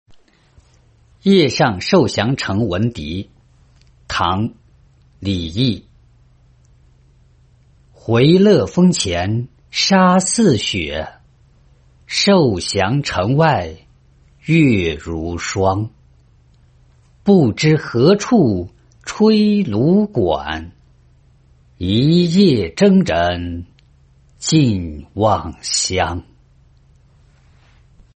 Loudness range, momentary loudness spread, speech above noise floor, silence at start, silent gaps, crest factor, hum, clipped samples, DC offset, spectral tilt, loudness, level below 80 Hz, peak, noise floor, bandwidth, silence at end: 8 LU; 14 LU; 37 dB; 1.25 s; none; 16 dB; none; under 0.1%; under 0.1%; -5.5 dB/octave; -16 LUFS; -46 dBFS; -2 dBFS; -52 dBFS; 8.8 kHz; 1.95 s